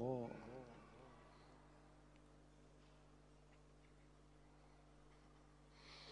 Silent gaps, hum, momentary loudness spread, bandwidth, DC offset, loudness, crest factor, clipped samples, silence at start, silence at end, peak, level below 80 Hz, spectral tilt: none; 50 Hz at -70 dBFS; 13 LU; 10 kHz; under 0.1%; -60 LUFS; 24 dB; under 0.1%; 0 s; 0 s; -32 dBFS; -72 dBFS; -6.5 dB/octave